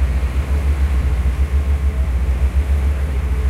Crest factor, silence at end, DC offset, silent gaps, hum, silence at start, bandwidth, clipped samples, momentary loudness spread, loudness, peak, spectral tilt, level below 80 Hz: 10 dB; 0 s; under 0.1%; none; none; 0 s; 11 kHz; under 0.1%; 2 LU; -19 LUFS; -8 dBFS; -7 dB/octave; -16 dBFS